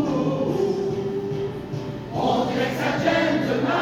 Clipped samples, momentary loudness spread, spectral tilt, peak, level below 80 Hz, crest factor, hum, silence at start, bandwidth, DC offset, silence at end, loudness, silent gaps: under 0.1%; 9 LU; -6.5 dB/octave; -8 dBFS; -50 dBFS; 16 dB; none; 0 s; 17 kHz; under 0.1%; 0 s; -24 LUFS; none